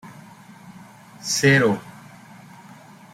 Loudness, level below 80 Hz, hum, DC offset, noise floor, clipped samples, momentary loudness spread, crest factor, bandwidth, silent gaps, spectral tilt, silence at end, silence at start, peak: -19 LUFS; -64 dBFS; none; under 0.1%; -45 dBFS; under 0.1%; 27 LU; 22 dB; 16 kHz; none; -4.5 dB/octave; 1.25 s; 0.05 s; -4 dBFS